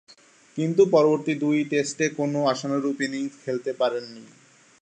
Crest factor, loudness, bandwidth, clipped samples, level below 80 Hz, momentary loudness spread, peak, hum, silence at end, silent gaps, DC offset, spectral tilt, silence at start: 18 dB; -24 LUFS; 9.6 kHz; under 0.1%; -78 dBFS; 11 LU; -6 dBFS; none; 0.55 s; none; under 0.1%; -5.5 dB/octave; 0.55 s